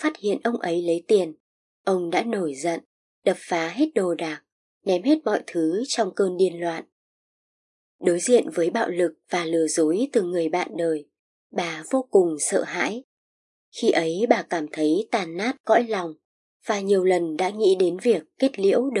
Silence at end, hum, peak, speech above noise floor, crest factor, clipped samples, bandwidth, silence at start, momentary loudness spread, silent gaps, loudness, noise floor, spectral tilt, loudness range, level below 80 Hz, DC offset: 0 s; none; -2 dBFS; over 67 dB; 22 dB; under 0.1%; 11.5 kHz; 0 s; 9 LU; 1.40-1.84 s, 2.86-3.22 s, 4.52-4.81 s, 6.92-7.99 s, 11.19-11.50 s, 13.04-13.72 s, 15.60-15.64 s, 16.25-16.60 s; -23 LUFS; under -90 dBFS; -4.5 dB/octave; 3 LU; -84 dBFS; under 0.1%